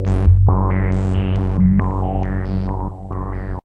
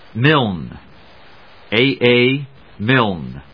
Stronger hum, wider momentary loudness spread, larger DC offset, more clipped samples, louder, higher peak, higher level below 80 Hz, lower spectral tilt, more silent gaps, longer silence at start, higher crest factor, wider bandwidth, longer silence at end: neither; second, 12 LU vs 16 LU; second, under 0.1% vs 0.4%; neither; second, -18 LUFS vs -15 LUFS; about the same, -2 dBFS vs 0 dBFS; first, -22 dBFS vs -48 dBFS; first, -10 dB/octave vs -8.5 dB/octave; neither; second, 0 s vs 0.15 s; about the same, 14 dB vs 18 dB; second, 3.6 kHz vs 5.4 kHz; about the same, 0.05 s vs 0.15 s